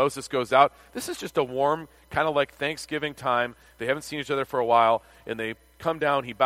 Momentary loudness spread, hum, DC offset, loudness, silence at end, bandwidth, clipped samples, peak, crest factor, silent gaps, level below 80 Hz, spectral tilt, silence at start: 12 LU; none; under 0.1%; -26 LUFS; 0 s; 16 kHz; under 0.1%; -4 dBFS; 22 dB; none; -58 dBFS; -4 dB/octave; 0 s